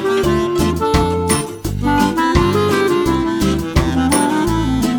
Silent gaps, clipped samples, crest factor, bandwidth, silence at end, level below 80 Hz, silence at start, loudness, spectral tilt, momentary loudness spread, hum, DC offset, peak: none; under 0.1%; 14 dB; over 20 kHz; 0 s; -26 dBFS; 0 s; -16 LUFS; -5.5 dB/octave; 3 LU; none; under 0.1%; 0 dBFS